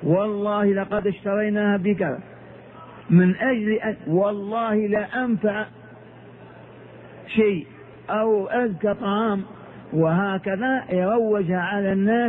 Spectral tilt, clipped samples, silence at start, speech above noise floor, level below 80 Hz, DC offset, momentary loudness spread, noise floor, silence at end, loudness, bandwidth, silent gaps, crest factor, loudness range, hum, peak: -11 dB/octave; under 0.1%; 0 s; 23 dB; -58 dBFS; under 0.1%; 13 LU; -44 dBFS; 0 s; -22 LUFS; 3.9 kHz; none; 18 dB; 4 LU; none; -6 dBFS